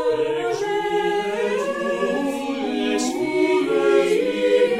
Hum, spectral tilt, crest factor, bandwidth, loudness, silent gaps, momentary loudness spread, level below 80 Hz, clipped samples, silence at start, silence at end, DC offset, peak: none; -4 dB/octave; 14 dB; 15 kHz; -21 LUFS; none; 6 LU; -58 dBFS; under 0.1%; 0 s; 0 s; under 0.1%; -6 dBFS